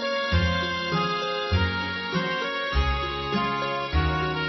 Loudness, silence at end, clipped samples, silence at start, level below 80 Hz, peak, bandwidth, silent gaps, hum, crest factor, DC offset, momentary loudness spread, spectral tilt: -25 LUFS; 0 s; under 0.1%; 0 s; -34 dBFS; -12 dBFS; 6.2 kHz; none; none; 14 dB; under 0.1%; 3 LU; -6 dB/octave